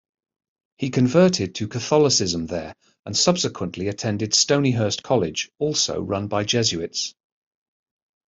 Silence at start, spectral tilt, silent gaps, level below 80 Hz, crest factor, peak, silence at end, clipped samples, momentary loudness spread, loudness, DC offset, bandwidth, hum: 0.8 s; -4 dB/octave; 2.99-3.03 s; -58 dBFS; 20 dB; -2 dBFS; 1.15 s; under 0.1%; 11 LU; -21 LUFS; under 0.1%; 8.2 kHz; none